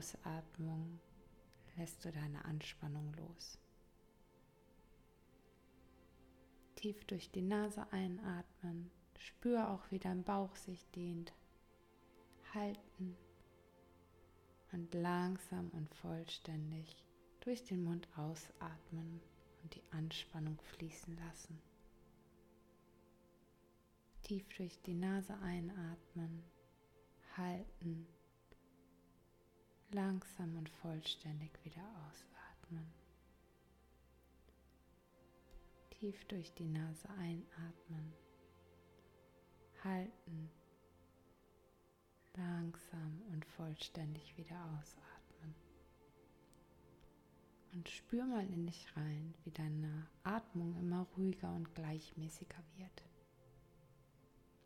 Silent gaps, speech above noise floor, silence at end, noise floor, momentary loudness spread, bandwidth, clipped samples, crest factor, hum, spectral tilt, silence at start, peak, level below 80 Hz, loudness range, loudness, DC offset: none; 27 dB; 0.1 s; -72 dBFS; 19 LU; 16.5 kHz; under 0.1%; 22 dB; none; -6 dB/octave; 0 s; -26 dBFS; -70 dBFS; 11 LU; -47 LUFS; under 0.1%